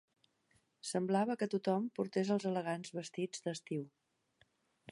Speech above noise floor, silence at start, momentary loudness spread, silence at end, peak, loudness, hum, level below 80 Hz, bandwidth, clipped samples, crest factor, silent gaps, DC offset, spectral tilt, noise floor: 39 dB; 0.85 s; 9 LU; 1.05 s; -20 dBFS; -38 LUFS; none; -88 dBFS; 11.5 kHz; under 0.1%; 18 dB; none; under 0.1%; -5.5 dB/octave; -76 dBFS